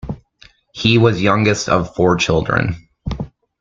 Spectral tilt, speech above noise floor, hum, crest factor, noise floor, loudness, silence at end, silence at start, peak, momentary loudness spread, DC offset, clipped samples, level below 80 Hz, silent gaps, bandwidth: -5.5 dB/octave; 35 dB; none; 16 dB; -50 dBFS; -16 LUFS; 0.35 s; 0.05 s; 0 dBFS; 18 LU; under 0.1%; under 0.1%; -38 dBFS; none; 7.6 kHz